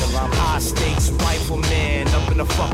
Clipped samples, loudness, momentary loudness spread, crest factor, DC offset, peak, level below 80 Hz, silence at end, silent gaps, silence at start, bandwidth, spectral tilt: under 0.1%; -20 LUFS; 1 LU; 10 dB; under 0.1%; -8 dBFS; -22 dBFS; 0 s; none; 0 s; 16 kHz; -4.5 dB/octave